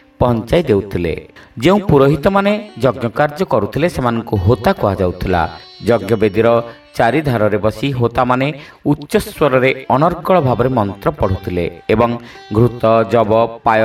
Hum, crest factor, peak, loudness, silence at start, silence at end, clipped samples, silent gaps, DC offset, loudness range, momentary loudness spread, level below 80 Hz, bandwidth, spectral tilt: none; 14 dB; 0 dBFS; -15 LUFS; 0.2 s; 0 s; under 0.1%; none; under 0.1%; 1 LU; 7 LU; -36 dBFS; 16 kHz; -7.5 dB/octave